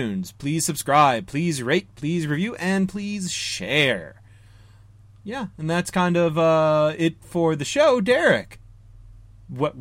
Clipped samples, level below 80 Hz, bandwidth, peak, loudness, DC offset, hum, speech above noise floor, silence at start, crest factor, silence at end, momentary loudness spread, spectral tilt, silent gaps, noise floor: under 0.1%; -54 dBFS; 16 kHz; -6 dBFS; -22 LUFS; under 0.1%; none; 27 dB; 0 s; 16 dB; 0 s; 11 LU; -5 dB/octave; none; -49 dBFS